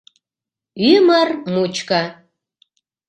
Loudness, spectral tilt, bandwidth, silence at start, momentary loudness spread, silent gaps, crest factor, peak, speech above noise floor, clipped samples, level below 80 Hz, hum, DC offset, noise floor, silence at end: -16 LUFS; -5 dB/octave; 9 kHz; 0.75 s; 8 LU; none; 18 dB; 0 dBFS; 72 dB; under 0.1%; -64 dBFS; none; under 0.1%; -88 dBFS; 0.95 s